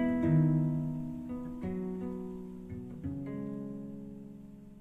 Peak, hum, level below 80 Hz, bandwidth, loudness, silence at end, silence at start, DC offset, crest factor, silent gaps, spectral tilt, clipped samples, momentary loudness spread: -16 dBFS; none; -58 dBFS; 3.5 kHz; -35 LUFS; 0 s; 0 s; under 0.1%; 18 dB; none; -10.5 dB/octave; under 0.1%; 19 LU